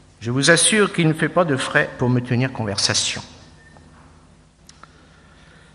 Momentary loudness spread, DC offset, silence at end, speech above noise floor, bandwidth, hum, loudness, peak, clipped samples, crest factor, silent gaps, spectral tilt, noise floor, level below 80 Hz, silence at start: 9 LU; under 0.1%; 2.4 s; 32 dB; 11.5 kHz; none; -18 LUFS; 0 dBFS; under 0.1%; 22 dB; none; -3.5 dB/octave; -51 dBFS; -54 dBFS; 0.2 s